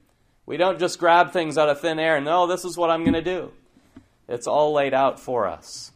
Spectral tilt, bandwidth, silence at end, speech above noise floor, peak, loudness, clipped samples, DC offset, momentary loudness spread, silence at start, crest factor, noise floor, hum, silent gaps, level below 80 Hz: -4.5 dB/octave; 15.5 kHz; 0.05 s; 31 dB; -4 dBFS; -21 LUFS; under 0.1%; under 0.1%; 13 LU; 0.45 s; 18 dB; -52 dBFS; none; none; -54 dBFS